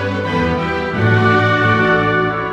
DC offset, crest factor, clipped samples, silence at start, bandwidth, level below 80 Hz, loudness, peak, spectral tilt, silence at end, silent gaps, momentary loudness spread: under 0.1%; 14 dB; under 0.1%; 0 s; 8 kHz; -38 dBFS; -14 LUFS; 0 dBFS; -7 dB/octave; 0 s; none; 6 LU